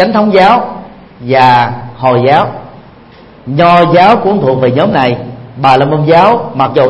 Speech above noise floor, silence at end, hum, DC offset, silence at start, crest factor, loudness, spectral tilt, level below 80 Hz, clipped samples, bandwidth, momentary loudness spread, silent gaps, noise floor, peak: 28 dB; 0 s; none; under 0.1%; 0 s; 8 dB; -8 LUFS; -7.5 dB/octave; -44 dBFS; 1%; 11 kHz; 14 LU; none; -36 dBFS; 0 dBFS